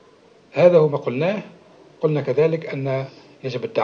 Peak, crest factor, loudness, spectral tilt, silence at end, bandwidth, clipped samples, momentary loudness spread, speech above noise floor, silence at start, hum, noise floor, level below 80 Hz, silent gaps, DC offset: -2 dBFS; 20 dB; -20 LUFS; -8 dB/octave; 0 s; 6.8 kHz; under 0.1%; 15 LU; 33 dB; 0.55 s; none; -52 dBFS; -70 dBFS; none; under 0.1%